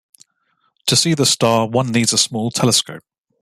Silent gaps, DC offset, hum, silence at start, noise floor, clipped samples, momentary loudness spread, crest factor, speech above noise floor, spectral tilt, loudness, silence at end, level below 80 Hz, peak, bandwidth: none; under 0.1%; none; 0.85 s; -65 dBFS; under 0.1%; 4 LU; 18 dB; 49 dB; -3.5 dB/octave; -15 LUFS; 0.45 s; -56 dBFS; -2 dBFS; 15 kHz